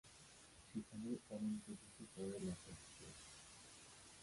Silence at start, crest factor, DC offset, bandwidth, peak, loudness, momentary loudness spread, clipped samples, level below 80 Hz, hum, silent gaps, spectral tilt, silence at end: 0.05 s; 16 dB; under 0.1%; 11.5 kHz; -34 dBFS; -52 LUFS; 13 LU; under 0.1%; -72 dBFS; none; none; -5 dB/octave; 0 s